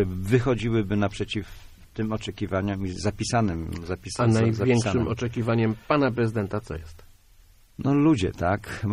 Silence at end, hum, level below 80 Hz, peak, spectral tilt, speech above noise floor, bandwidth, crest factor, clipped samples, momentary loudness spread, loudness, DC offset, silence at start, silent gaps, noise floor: 0 s; none; -44 dBFS; -8 dBFS; -6.5 dB/octave; 30 dB; 13 kHz; 18 dB; under 0.1%; 11 LU; -25 LUFS; under 0.1%; 0 s; none; -54 dBFS